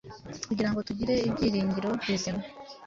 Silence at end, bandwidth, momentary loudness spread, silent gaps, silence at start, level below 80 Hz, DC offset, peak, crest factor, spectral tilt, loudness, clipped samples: 0 s; 7.6 kHz; 12 LU; none; 0.05 s; -52 dBFS; under 0.1%; -14 dBFS; 16 dB; -5.5 dB/octave; -29 LUFS; under 0.1%